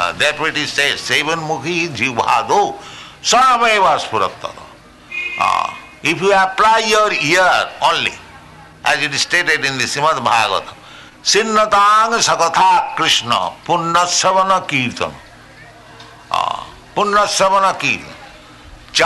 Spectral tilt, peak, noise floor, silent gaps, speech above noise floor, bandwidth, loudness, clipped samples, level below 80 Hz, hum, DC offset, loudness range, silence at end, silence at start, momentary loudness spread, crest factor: -2 dB/octave; -4 dBFS; -40 dBFS; none; 25 dB; 12.5 kHz; -14 LUFS; under 0.1%; -50 dBFS; none; under 0.1%; 4 LU; 0 s; 0 s; 11 LU; 12 dB